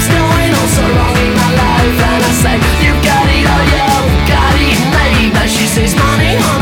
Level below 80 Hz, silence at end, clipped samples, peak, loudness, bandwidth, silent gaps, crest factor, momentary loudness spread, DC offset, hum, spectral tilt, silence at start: -16 dBFS; 0 s; under 0.1%; 0 dBFS; -10 LUFS; 17.5 kHz; none; 10 dB; 1 LU; under 0.1%; none; -4.5 dB/octave; 0 s